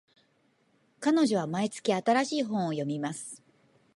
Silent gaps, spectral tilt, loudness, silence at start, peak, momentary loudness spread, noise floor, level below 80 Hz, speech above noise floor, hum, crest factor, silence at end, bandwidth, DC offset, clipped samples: none; -5 dB/octave; -29 LUFS; 1 s; -14 dBFS; 12 LU; -69 dBFS; -78 dBFS; 41 dB; none; 18 dB; 0.6 s; 11.5 kHz; under 0.1%; under 0.1%